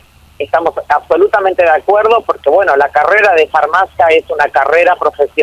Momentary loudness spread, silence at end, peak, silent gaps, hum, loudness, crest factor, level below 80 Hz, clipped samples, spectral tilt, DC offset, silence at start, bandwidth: 5 LU; 0 s; 0 dBFS; none; none; -10 LUFS; 10 dB; -46 dBFS; under 0.1%; -4.5 dB/octave; under 0.1%; 0.4 s; 13 kHz